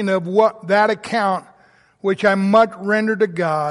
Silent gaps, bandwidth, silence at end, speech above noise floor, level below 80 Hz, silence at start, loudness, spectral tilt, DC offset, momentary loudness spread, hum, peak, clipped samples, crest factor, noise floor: none; 11.5 kHz; 0 s; 36 dB; -64 dBFS; 0 s; -18 LUFS; -6.5 dB/octave; under 0.1%; 7 LU; none; -2 dBFS; under 0.1%; 14 dB; -53 dBFS